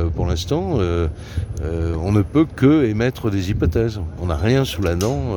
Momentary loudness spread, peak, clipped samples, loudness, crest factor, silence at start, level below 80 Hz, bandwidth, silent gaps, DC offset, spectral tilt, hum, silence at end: 9 LU; -2 dBFS; under 0.1%; -20 LUFS; 16 dB; 0 s; -30 dBFS; 19 kHz; none; under 0.1%; -7 dB/octave; none; 0 s